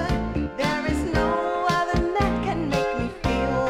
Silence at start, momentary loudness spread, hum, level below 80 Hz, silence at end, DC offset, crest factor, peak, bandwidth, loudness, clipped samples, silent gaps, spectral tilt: 0 s; 3 LU; none; -34 dBFS; 0 s; under 0.1%; 14 dB; -8 dBFS; 16 kHz; -24 LUFS; under 0.1%; none; -6 dB/octave